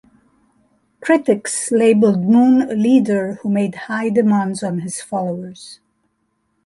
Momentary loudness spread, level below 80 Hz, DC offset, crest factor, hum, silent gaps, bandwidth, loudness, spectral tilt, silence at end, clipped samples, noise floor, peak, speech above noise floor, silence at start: 13 LU; -62 dBFS; under 0.1%; 14 dB; none; none; 11.5 kHz; -16 LUFS; -6 dB/octave; 0.9 s; under 0.1%; -68 dBFS; -2 dBFS; 52 dB; 1 s